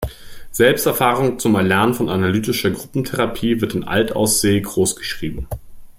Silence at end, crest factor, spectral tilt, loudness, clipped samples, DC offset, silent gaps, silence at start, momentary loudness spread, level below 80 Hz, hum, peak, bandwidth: 0.05 s; 16 dB; -4.5 dB/octave; -18 LUFS; under 0.1%; under 0.1%; none; 0 s; 12 LU; -40 dBFS; none; -2 dBFS; 16.5 kHz